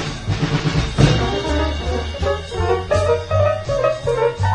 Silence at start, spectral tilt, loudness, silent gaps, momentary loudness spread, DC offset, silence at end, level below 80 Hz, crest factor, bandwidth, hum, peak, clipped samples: 0 s; -6 dB/octave; -19 LUFS; none; 6 LU; under 0.1%; 0 s; -28 dBFS; 18 dB; 10.5 kHz; none; 0 dBFS; under 0.1%